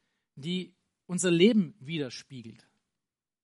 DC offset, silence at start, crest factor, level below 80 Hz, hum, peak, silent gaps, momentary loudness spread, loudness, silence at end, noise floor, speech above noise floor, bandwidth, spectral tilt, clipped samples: under 0.1%; 0.35 s; 20 dB; -76 dBFS; none; -10 dBFS; none; 23 LU; -28 LUFS; 0.9 s; -89 dBFS; 61 dB; 11.5 kHz; -5 dB/octave; under 0.1%